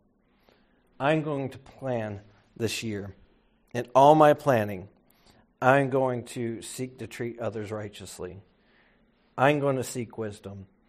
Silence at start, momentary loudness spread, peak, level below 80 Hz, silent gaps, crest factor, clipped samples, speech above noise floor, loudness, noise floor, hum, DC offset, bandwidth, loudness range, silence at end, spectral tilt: 1 s; 20 LU; -4 dBFS; -64 dBFS; none; 24 dB; under 0.1%; 39 dB; -26 LUFS; -65 dBFS; none; under 0.1%; 15 kHz; 9 LU; 0.25 s; -6 dB/octave